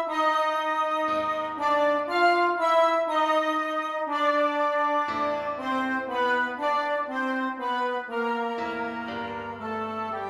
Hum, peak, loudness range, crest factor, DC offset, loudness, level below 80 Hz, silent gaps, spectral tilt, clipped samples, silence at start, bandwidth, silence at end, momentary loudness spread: none; -10 dBFS; 5 LU; 16 dB; under 0.1%; -26 LUFS; -68 dBFS; none; -4 dB/octave; under 0.1%; 0 s; 14.5 kHz; 0 s; 9 LU